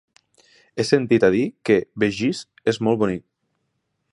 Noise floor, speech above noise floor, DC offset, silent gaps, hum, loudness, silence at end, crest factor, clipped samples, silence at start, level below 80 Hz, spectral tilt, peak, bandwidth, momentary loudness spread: -74 dBFS; 54 dB; under 0.1%; none; none; -21 LUFS; 0.95 s; 18 dB; under 0.1%; 0.75 s; -56 dBFS; -6 dB/octave; -4 dBFS; 11.5 kHz; 9 LU